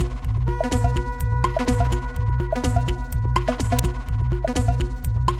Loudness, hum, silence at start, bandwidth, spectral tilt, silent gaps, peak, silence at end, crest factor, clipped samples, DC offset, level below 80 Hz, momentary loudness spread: -23 LUFS; none; 0 s; 16.5 kHz; -6.5 dB/octave; none; -4 dBFS; 0 s; 16 dB; under 0.1%; under 0.1%; -26 dBFS; 4 LU